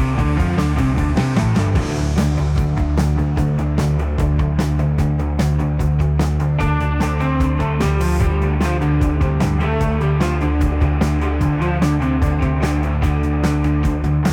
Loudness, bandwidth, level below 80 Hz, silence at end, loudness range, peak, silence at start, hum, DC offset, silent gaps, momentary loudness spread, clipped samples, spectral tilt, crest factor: -18 LUFS; 13.5 kHz; -22 dBFS; 0 s; 1 LU; -6 dBFS; 0 s; none; under 0.1%; none; 1 LU; under 0.1%; -7.5 dB/octave; 12 dB